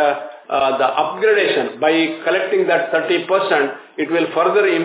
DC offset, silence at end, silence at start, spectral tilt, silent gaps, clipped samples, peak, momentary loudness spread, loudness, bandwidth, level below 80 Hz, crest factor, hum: under 0.1%; 0 s; 0 s; -8 dB/octave; none; under 0.1%; -2 dBFS; 5 LU; -17 LUFS; 4 kHz; -70 dBFS; 14 dB; none